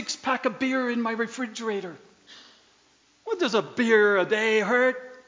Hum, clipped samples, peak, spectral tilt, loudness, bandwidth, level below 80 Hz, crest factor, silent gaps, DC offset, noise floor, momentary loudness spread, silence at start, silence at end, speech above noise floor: none; under 0.1%; -8 dBFS; -4 dB/octave; -24 LUFS; 7.6 kHz; -78 dBFS; 18 dB; none; under 0.1%; -62 dBFS; 12 LU; 0 s; 0.05 s; 38 dB